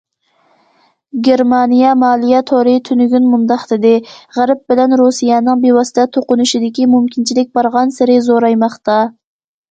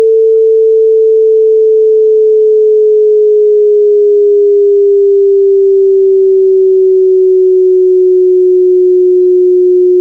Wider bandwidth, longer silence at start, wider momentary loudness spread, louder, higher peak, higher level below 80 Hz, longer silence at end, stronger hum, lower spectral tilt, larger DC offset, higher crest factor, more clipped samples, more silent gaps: first, 8.8 kHz vs 0.6 kHz; first, 1.15 s vs 0 s; first, 5 LU vs 0 LU; second, -12 LUFS vs -7 LUFS; about the same, 0 dBFS vs 0 dBFS; about the same, -60 dBFS vs -64 dBFS; first, 0.6 s vs 0 s; neither; second, -4.5 dB/octave vs -8 dB/octave; second, under 0.1% vs 0.5%; first, 12 dB vs 6 dB; neither; neither